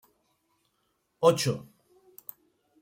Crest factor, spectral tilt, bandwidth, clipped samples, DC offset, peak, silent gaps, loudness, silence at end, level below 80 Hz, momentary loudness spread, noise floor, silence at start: 24 dB; -5 dB/octave; 16.5 kHz; under 0.1%; under 0.1%; -8 dBFS; none; -26 LUFS; 1.2 s; -74 dBFS; 22 LU; -75 dBFS; 1.2 s